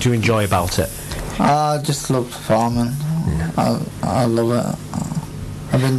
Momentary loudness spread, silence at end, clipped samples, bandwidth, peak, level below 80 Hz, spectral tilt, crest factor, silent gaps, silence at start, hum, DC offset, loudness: 9 LU; 0 s; under 0.1%; 14 kHz; -8 dBFS; -36 dBFS; -6 dB/octave; 12 dB; none; 0 s; none; under 0.1%; -19 LUFS